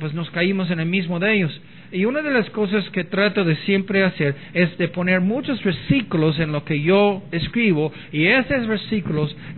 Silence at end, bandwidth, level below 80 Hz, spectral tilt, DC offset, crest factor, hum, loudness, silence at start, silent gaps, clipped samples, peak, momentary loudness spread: 0 s; 4.4 kHz; -50 dBFS; -10 dB/octave; 0.5%; 16 dB; none; -20 LUFS; 0 s; none; under 0.1%; -4 dBFS; 7 LU